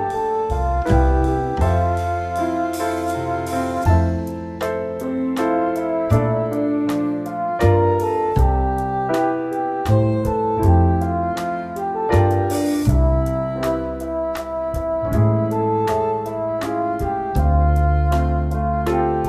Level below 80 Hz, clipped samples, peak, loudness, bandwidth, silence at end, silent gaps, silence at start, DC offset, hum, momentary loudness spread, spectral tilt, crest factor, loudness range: -26 dBFS; under 0.1%; -2 dBFS; -20 LUFS; 14 kHz; 0 s; none; 0 s; under 0.1%; none; 7 LU; -8 dB/octave; 16 dB; 2 LU